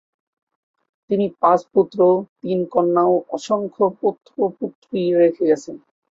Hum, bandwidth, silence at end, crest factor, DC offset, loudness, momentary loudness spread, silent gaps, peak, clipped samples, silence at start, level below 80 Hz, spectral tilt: none; 7.8 kHz; 0.35 s; 16 dB; under 0.1%; -19 LUFS; 8 LU; 2.29-2.36 s, 4.75-4.82 s; -4 dBFS; under 0.1%; 1.1 s; -66 dBFS; -7.5 dB/octave